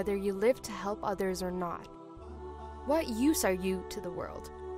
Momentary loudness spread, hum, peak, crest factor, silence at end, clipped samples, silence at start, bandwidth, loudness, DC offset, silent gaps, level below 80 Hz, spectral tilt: 16 LU; none; -14 dBFS; 18 dB; 0 s; under 0.1%; 0 s; 16 kHz; -33 LUFS; under 0.1%; none; -50 dBFS; -5 dB/octave